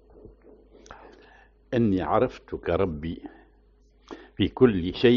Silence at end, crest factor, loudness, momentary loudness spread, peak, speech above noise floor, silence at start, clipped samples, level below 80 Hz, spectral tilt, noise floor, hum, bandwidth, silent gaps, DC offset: 0 s; 22 dB; -25 LUFS; 25 LU; -6 dBFS; 35 dB; 0.9 s; under 0.1%; -48 dBFS; -5.5 dB/octave; -59 dBFS; none; 6.6 kHz; none; under 0.1%